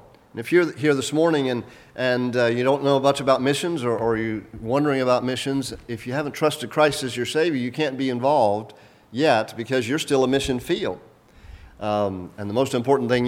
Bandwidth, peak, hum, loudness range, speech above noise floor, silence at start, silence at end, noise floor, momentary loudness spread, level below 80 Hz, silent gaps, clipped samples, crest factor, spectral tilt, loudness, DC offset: 16.5 kHz; -4 dBFS; none; 3 LU; 23 dB; 0.35 s; 0 s; -45 dBFS; 10 LU; -52 dBFS; none; under 0.1%; 18 dB; -5 dB/octave; -22 LUFS; under 0.1%